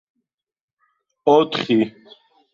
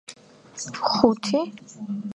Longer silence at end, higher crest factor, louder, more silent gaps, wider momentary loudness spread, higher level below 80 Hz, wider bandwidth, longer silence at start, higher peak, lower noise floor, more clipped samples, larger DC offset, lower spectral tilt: first, 0.65 s vs 0.05 s; about the same, 20 dB vs 24 dB; first, -19 LUFS vs -24 LUFS; neither; second, 8 LU vs 20 LU; about the same, -66 dBFS vs -62 dBFS; second, 7.4 kHz vs 11 kHz; first, 1.25 s vs 0.1 s; about the same, -2 dBFS vs -2 dBFS; first, -77 dBFS vs -47 dBFS; neither; neither; first, -6 dB/octave vs -4.5 dB/octave